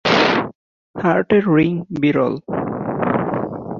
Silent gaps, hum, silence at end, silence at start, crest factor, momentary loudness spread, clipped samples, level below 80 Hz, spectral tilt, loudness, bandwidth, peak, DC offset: 0.55-0.94 s; none; 0 s; 0.05 s; 16 dB; 9 LU; under 0.1%; -50 dBFS; -6.5 dB/octave; -18 LUFS; 7.2 kHz; -2 dBFS; under 0.1%